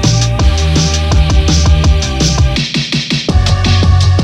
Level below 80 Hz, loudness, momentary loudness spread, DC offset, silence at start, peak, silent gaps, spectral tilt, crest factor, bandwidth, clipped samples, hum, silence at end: -14 dBFS; -11 LUFS; 4 LU; under 0.1%; 0 s; 0 dBFS; none; -4.5 dB/octave; 10 dB; 11.5 kHz; under 0.1%; none; 0 s